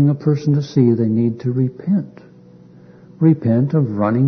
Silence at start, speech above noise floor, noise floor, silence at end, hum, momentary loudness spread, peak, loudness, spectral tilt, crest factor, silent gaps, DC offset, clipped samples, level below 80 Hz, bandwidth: 0 s; 28 dB; -44 dBFS; 0 s; none; 5 LU; -2 dBFS; -17 LUFS; -10 dB/octave; 16 dB; none; under 0.1%; under 0.1%; -60 dBFS; 6.4 kHz